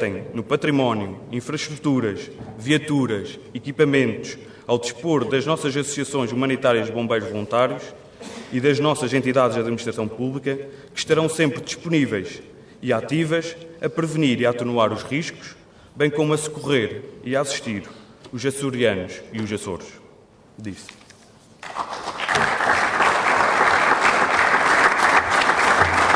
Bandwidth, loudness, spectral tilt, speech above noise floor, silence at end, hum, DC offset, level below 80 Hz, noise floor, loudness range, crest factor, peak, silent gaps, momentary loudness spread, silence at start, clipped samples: 11 kHz; -21 LUFS; -4.5 dB/octave; 28 dB; 0 s; none; under 0.1%; -56 dBFS; -50 dBFS; 9 LU; 18 dB; -4 dBFS; none; 17 LU; 0 s; under 0.1%